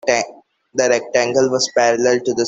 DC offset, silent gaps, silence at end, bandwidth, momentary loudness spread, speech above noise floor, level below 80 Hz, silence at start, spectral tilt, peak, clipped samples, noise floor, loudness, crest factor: under 0.1%; none; 0 s; 8.2 kHz; 6 LU; 22 dB; -60 dBFS; 0.05 s; -3 dB/octave; -2 dBFS; under 0.1%; -38 dBFS; -17 LUFS; 16 dB